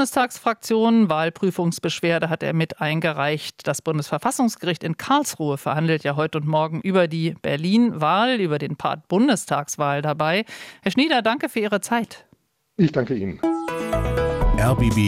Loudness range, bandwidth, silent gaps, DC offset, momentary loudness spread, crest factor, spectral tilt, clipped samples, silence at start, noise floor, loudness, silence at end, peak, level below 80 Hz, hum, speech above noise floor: 2 LU; 16 kHz; none; under 0.1%; 7 LU; 16 dB; -5.5 dB/octave; under 0.1%; 0 s; -61 dBFS; -22 LUFS; 0 s; -6 dBFS; -36 dBFS; none; 40 dB